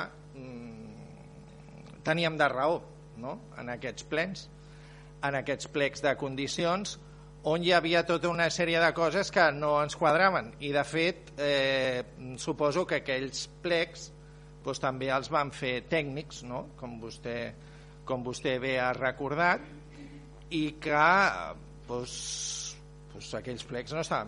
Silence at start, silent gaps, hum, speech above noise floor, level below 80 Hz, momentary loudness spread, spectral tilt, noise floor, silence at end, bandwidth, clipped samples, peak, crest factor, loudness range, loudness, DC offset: 0 s; none; none; 20 dB; -56 dBFS; 21 LU; -4 dB/octave; -50 dBFS; 0 s; 10.5 kHz; under 0.1%; -8 dBFS; 22 dB; 7 LU; -30 LUFS; under 0.1%